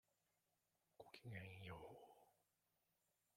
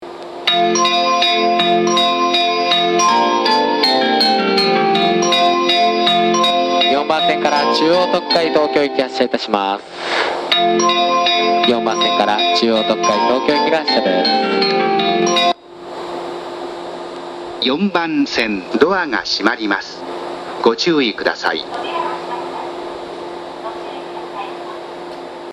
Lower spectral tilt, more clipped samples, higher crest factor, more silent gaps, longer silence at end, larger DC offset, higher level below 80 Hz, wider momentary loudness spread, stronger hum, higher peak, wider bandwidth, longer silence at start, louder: first, -6 dB/octave vs -3.5 dB/octave; neither; first, 22 dB vs 16 dB; neither; first, 1.05 s vs 0 s; neither; second, -84 dBFS vs -58 dBFS; second, 10 LU vs 15 LU; neither; second, -40 dBFS vs 0 dBFS; first, 16 kHz vs 13.5 kHz; first, 1 s vs 0 s; second, -59 LUFS vs -15 LUFS